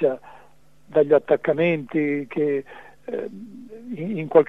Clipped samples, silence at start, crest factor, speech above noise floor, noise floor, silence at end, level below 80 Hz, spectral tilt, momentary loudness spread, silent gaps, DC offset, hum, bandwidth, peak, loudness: under 0.1%; 0 s; 20 dB; 34 dB; -55 dBFS; 0.05 s; -66 dBFS; -9 dB/octave; 22 LU; none; 0.3%; none; 4 kHz; -2 dBFS; -23 LUFS